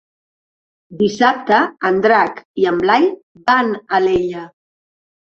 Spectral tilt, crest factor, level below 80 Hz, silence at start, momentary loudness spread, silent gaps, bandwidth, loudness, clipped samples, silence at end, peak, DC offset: -5.5 dB/octave; 16 dB; -52 dBFS; 0.9 s; 7 LU; 2.45-2.54 s, 3.23-3.35 s; 7.4 kHz; -16 LUFS; under 0.1%; 0.9 s; -2 dBFS; under 0.1%